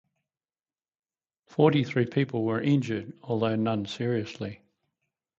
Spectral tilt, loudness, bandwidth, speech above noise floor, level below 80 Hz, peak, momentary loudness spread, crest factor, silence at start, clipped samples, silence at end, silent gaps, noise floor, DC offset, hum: -7.5 dB/octave; -27 LUFS; 7.8 kHz; over 64 dB; -66 dBFS; -8 dBFS; 13 LU; 22 dB; 1.6 s; under 0.1%; 0.85 s; none; under -90 dBFS; under 0.1%; none